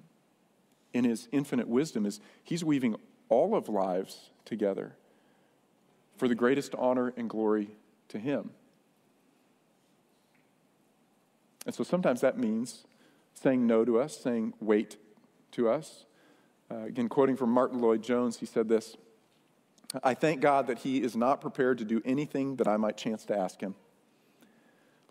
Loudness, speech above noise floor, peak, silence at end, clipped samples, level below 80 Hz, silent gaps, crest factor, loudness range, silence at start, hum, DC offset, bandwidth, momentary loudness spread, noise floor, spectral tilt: -30 LUFS; 39 dB; -12 dBFS; 1.4 s; under 0.1%; -78 dBFS; none; 20 dB; 5 LU; 0.95 s; none; under 0.1%; 15.5 kHz; 15 LU; -68 dBFS; -6 dB/octave